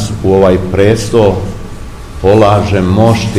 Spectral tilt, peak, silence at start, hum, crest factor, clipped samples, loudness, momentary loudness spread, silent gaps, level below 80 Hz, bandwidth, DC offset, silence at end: -7 dB/octave; 0 dBFS; 0 s; none; 10 dB; 2%; -9 LUFS; 18 LU; none; -26 dBFS; 13.5 kHz; 0.9%; 0 s